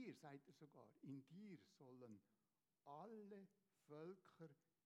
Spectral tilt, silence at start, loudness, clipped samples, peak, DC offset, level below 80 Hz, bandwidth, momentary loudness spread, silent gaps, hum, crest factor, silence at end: -7 dB/octave; 0 s; -63 LUFS; under 0.1%; -46 dBFS; under 0.1%; under -90 dBFS; 9.6 kHz; 8 LU; none; none; 16 dB; 0.3 s